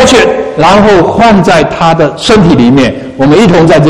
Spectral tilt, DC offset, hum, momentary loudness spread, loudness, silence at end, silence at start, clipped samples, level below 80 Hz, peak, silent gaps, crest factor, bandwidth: -5.5 dB/octave; 2%; none; 4 LU; -5 LUFS; 0 s; 0 s; 6%; -28 dBFS; 0 dBFS; none; 4 dB; 13 kHz